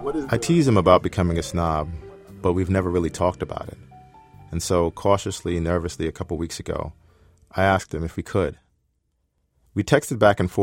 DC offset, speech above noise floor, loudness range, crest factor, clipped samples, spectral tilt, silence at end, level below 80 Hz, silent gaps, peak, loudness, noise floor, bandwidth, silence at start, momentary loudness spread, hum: under 0.1%; 49 dB; 5 LU; 22 dB; under 0.1%; -6 dB/octave; 0 s; -42 dBFS; none; -2 dBFS; -23 LUFS; -71 dBFS; 16.5 kHz; 0 s; 14 LU; none